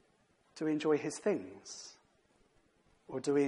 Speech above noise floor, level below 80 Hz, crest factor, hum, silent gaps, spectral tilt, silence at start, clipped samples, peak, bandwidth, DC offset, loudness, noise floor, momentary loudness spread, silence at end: 37 dB; -80 dBFS; 18 dB; none; none; -5 dB/octave; 0.55 s; under 0.1%; -20 dBFS; 11.5 kHz; under 0.1%; -35 LUFS; -72 dBFS; 15 LU; 0 s